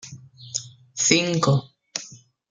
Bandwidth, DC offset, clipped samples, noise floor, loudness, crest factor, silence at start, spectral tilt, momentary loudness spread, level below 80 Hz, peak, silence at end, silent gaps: 10 kHz; under 0.1%; under 0.1%; -46 dBFS; -23 LUFS; 24 dB; 0.05 s; -3.5 dB/octave; 24 LU; -62 dBFS; 0 dBFS; 0.35 s; none